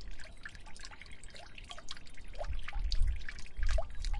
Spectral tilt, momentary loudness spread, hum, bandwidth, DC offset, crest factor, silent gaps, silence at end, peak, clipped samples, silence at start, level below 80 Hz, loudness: -4 dB/octave; 13 LU; none; 10.5 kHz; under 0.1%; 16 dB; none; 0 s; -18 dBFS; under 0.1%; 0 s; -38 dBFS; -43 LUFS